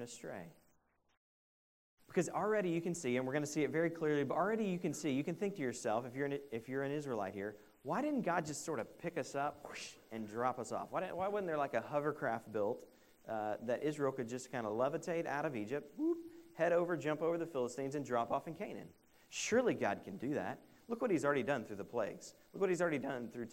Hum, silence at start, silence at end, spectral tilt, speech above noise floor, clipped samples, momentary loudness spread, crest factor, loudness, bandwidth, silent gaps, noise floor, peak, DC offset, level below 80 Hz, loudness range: none; 0 s; 0 s; -5.5 dB/octave; 37 dB; under 0.1%; 12 LU; 20 dB; -39 LUFS; 16 kHz; 1.17-1.97 s; -75 dBFS; -20 dBFS; under 0.1%; -78 dBFS; 3 LU